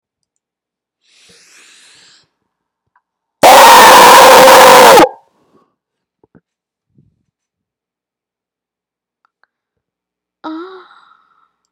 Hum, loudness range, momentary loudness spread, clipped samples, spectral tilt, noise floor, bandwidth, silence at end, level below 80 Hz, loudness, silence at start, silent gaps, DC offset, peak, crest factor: 60 Hz at -45 dBFS; 8 LU; 26 LU; 6%; -1.5 dB/octave; -85 dBFS; over 20 kHz; 1.1 s; -46 dBFS; -2 LUFS; 3.45 s; none; under 0.1%; 0 dBFS; 10 dB